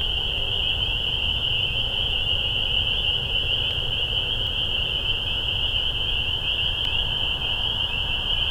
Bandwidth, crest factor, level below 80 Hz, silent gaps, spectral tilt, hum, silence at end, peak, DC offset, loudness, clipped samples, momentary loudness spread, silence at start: 18 kHz; 12 dB; -32 dBFS; none; -3.5 dB/octave; none; 0 s; -12 dBFS; under 0.1%; -22 LUFS; under 0.1%; 2 LU; 0 s